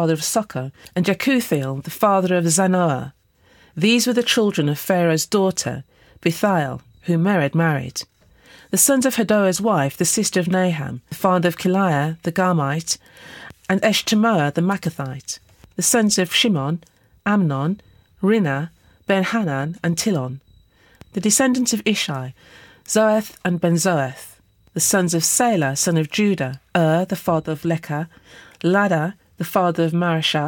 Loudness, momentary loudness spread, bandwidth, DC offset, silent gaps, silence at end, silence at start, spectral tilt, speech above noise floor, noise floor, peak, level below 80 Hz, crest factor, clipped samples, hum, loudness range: -19 LUFS; 13 LU; 19 kHz; under 0.1%; none; 0 s; 0 s; -4.5 dB/octave; 35 dB; -54 dBFS; -4 dBFS; -58 dBFS; 16 dB; under 0.1%; none; 3 LU